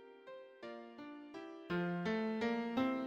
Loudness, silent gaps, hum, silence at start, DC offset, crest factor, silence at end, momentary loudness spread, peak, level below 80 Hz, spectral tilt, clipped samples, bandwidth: -40 LUFS; none; none; 0 s; under 0.1%; 16 dB; 0 s; 16 LU; -24 dBFS; -74 dBFS; -7 dB/octave; under 0.1%; 7.8 kHz